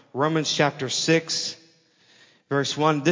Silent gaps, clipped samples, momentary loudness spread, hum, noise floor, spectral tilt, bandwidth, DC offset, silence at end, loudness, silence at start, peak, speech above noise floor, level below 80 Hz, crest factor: none; under 0.1%; 7 LU; none; -59 dBFS; -4 dB/octave; 7.6 kHz; under 0.1%; 0 s; -23 LUFS; 0.15 s; -6 dBFS; 36 dB; -74 dBFS; 18 dB